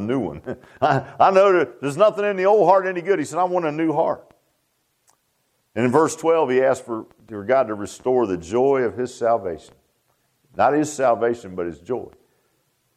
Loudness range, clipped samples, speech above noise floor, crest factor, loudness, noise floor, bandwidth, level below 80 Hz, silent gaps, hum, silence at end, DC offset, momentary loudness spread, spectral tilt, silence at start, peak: 5 LU; under 0.1%; 49 dB; 18 dB; -20 LUFS; -69 dBFS; 13 kHz; -60 dBFS; none; none; 0.85 s; under 0.1%; 15 LU; -6 dB/octave; 0 s; -2 dBFS